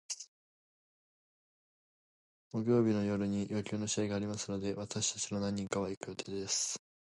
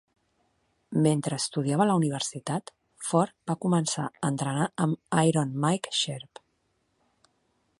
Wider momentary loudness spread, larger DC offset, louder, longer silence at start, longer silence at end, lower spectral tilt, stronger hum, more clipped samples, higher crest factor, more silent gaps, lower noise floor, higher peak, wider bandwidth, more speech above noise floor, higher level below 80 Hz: about the same, 11 LU vs 9 LU; neither; second, -35 LUFS vs -27 LUFS; second, 0.1 s vs 0.9 s; second, 0.4 s vs 1.6 s; about the same, -4.5 dB/octave vs -5 dB/octave; neither; neither; about the same, 20 dB vs 20 dB; first, 0.28-2.51 s, 5.97-6.01 s vs none; first, under -90 dBFS vs -73 dBFS; second, -18 dBFS vs -8 dBFS; about the same, 11.5 kHz vs 11.5 kHz; first, over 55 dB vs 47 dB; about the same, -66 dBFS vs -70 dBFS